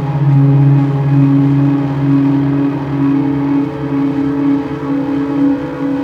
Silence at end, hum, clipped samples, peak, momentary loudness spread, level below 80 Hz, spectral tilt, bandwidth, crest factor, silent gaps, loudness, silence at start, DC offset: 0 s; none; under 0.1%; 0 dBFS; 7 LU; -42 dBFS; -10.5 dB/octave; 5 kHz; 12 dB; none; -13 LUFS; 0 s; under 0.1%